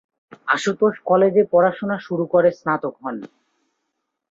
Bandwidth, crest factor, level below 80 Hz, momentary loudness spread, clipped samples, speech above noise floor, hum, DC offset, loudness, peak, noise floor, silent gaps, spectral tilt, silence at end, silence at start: 7.8 kHz; 16 dB; -66 dBFS; 15 LU; under 0.1%; 58 dB; none; under 0.1%; -19 LUFS; -4 dBFS; -77 dBFS; none; -6 dB/octave; 1.05 s; 0.45 s